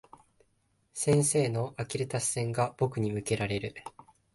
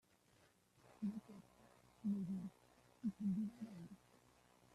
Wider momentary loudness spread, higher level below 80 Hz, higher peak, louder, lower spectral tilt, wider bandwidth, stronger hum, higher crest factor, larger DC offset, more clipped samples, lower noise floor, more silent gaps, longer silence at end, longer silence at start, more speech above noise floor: second, 14 LU vs 19 LU; first, -60 dBFS vs -80 dBFS; first, -14 dBFS vs -34 dBFS; first, -30 LUFS vs -47 LUFS; second, -5 dB/octave vs -8.5 dB/octave; about the same, 12 kHz vs 12.5 kHz; neither; about the same, 18 dB vs 16 dB; neither; neither; about the same, -72 dBFS vs -74 dBFS; neither; second, 0.45 s vs 0.8 s; about the same, 0.95 s vs 0.85 s; first, 42 dB vs 30 dB